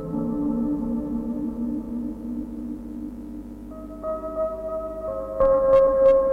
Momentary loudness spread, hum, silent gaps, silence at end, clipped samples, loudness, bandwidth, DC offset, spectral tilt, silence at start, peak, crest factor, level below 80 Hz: 18 LU; 50 Hz at -45 dBFS; none; 0 s; under 0.1%; -24 LUFS; 4 kHz; under 0.1%; -9.5 dB/octave; 0 s; -8 dBFS; 16 dB; -42 dBFS